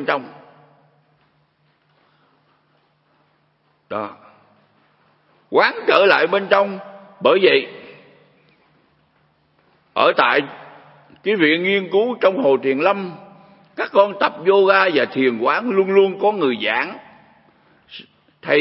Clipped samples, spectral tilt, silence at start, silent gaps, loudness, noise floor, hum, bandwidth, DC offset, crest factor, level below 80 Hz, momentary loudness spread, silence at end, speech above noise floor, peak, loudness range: under 0.1%; -7.5 dB/octave; 0 s; none; -17 LUFS; -62 dBFS; none; 5.8 kHz; under 0.1%; 20 dB; -74 dBFS; 19 LU; 0 s; 46 dB; 0 dBFS; 20 LU